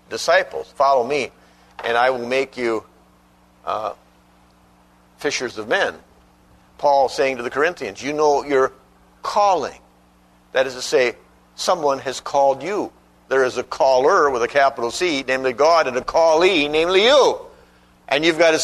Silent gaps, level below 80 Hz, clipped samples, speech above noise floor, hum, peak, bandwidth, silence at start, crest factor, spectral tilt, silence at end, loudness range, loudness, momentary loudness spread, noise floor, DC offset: none; -54 dBFS; under 0.1%; 36 dB; 60 Hz at -55 dBFS; -2 dBFS; 13.5 kHz; 0.1 s; 18 dB; -3 dB/octave; 0 s; 10 LU; -19 LUFS; 11 LU; -54 dBFS; under 0.1%